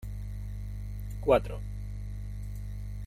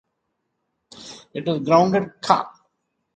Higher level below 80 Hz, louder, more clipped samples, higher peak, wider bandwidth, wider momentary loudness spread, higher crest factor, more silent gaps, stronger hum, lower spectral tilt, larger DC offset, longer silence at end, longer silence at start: first, -40 dBFS vs -62 dBFS; second, -34 LUFS vs -20 LUFS; neither; second, -10 dBFS vs 0 dBFS; first, 15.5 kHz vs 9.2 kHz; second, 14 LU vs 22 LU; about the same, 22 dB vs 24 dB; neither; first, 50 Hz at -35 dBFS vs none; first, -7.5 dB/octave vs -6 dB/octave; neither; second, 0 s vs 0.65 s; second, 0 s vs 0.95 s